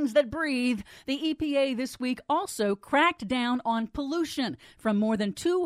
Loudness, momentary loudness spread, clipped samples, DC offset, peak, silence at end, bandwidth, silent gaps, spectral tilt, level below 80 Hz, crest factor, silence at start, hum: -28 LUFS; 8 LU; under 0.1%; under 0.1%; -10 dBFS; 0 s; 15.5 kHz; none; -4.5 dB/octave; -56 dBFS; 16 dB; 0 s; none